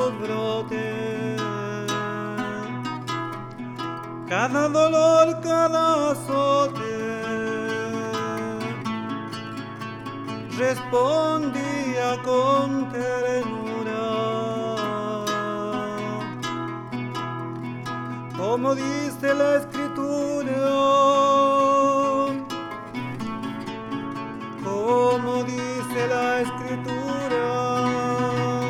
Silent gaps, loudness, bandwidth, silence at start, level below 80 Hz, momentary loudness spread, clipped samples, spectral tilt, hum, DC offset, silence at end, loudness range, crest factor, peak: none; -24 LUFS; 16.5 kHz; 0 s; -62 dBFS; 13 LU; under 0.1%; -5.5 dB/octave; none; under 0.1%; 0 s; 8 LU; 18 dB; -6 dBFS